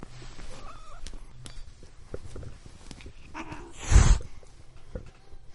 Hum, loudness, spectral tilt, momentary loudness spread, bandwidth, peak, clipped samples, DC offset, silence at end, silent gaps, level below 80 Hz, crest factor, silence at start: none; -27 LUFS; -4.5 dB/octave; 25 LU; 11.5 kHz; -6 dBFS; under 0.1%; under 0.1%; 0 s; none; -30 dBFS; 24 dB; 0 s